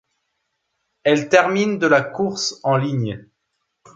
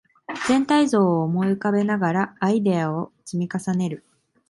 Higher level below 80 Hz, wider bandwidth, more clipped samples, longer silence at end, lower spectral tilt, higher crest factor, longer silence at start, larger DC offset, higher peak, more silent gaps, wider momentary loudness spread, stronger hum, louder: about the same, -62 dBFS vs -62 dBFS; second, 9 kHz vs 11.5 kHz; neither; first, 0.75 s vs 0.5 s; second, -5 dB/octave vs -6.5 dB/octave; about the same, 18 dB vs 14 dB; first, 1.05 s vs 0.3 s; neither; first, -2 dBFS vs -8 dBFS; neither; about the same, 9 LU vs 11 LU; neither; first, -19 LUFS vs -22 LUFS